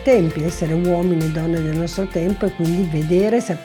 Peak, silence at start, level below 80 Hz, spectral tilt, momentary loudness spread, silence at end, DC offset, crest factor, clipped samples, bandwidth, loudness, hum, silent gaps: -4 dBFS; 0 s; -36 dBFS; -7 dB/octave; 5 LU; 0 s; under 0.1%; 14 dB; under 0.1%; 18 kHz; -19 LUFS; none; none